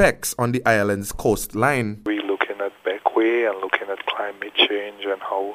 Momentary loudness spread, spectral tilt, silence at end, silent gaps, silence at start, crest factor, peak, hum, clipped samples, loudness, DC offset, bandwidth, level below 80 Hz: 8 LU; -4 dB/octave; 0 s; none; 0 s; 20 dB; -2 dBFS; none; under 0.1%; -22 LUFS; under 0.1%; 15.5 kHz; -46 dBFS